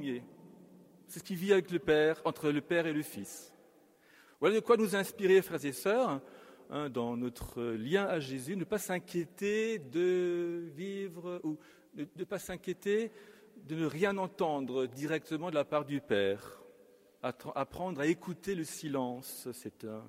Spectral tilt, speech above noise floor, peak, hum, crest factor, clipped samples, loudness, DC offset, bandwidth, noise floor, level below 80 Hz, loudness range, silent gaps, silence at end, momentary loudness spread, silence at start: -5.5 dB/octave; 30 dB; -12 dBFS; none; 22 dB; under 0.1%; -34 LUFS; under 0.1%; 16 kHz; -64 dBFS; -66 dBFS; 6 LU; none; 0 s; 14 LU; 0 s